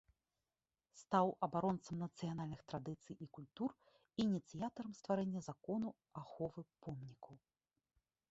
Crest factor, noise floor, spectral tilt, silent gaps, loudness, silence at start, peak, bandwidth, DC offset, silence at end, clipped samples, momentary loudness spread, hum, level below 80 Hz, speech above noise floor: 24 dB; under -90 dBFS; -7 dB/octave; none; -43 LUFS; 0.95 s; -20 dBFS; 8 kHz; under 0.1%; 0.95 s; under 0.1%; 15 LU; none; -76 dBFS; over 47 dB